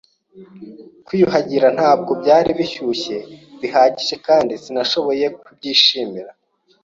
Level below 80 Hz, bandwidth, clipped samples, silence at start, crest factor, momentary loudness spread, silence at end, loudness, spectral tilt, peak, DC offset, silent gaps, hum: -56 dBFS; 7.6 kHz; under 0.1%; 0.35 s; 18 dB; 13 LU; 0.5 s; -16 LUFS; -4.5 dB/octave; 0 dBFS; under 0.1%; none; none